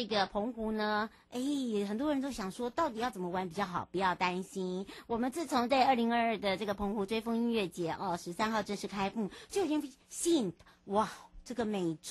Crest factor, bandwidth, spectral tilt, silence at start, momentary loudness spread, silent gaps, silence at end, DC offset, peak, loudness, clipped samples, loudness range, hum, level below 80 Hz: 18 dB; 12.5 kHz; -4.5 dB/octave; 0 s; 8 LU; none; 0 s; under 0.1%; -16 dBFS; -34 LUFS; under 0.1%; 3 LU; none; -62 dBFS